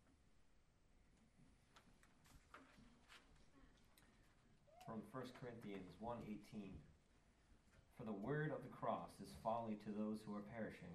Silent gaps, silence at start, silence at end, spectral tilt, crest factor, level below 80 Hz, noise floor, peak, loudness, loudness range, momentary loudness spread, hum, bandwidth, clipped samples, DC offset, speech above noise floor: none; 0.05 s; 0 s; -7 dB/octave; 22 dB; -74 dBFS; -76 dBFS; -32 dBFS; -51 LUFS; 11 LU; 20 LU; none; 13 kHz; under 0.1%; under 0.1%; 26 dB